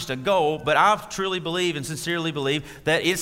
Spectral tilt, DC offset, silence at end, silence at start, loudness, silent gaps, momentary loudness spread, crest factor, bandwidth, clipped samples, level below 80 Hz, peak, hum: -4 dB/octave; under 0.1%; 0 s; 0 s; -23 LUFS; none; 7 LU; 18 dB; 16 kHz; under 0.1%; -54 dBFS; -6 dBFS; none